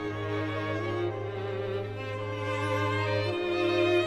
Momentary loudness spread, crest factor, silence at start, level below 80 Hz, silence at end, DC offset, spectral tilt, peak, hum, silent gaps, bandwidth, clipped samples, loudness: 7 LU; 16 dB; 0 s; -58 dBFS; 0 s; under 0.1%; -6.5 dB/octave; -14 dBFS; none; none; 11.5 kHz; under 0.1%; -30 LUFS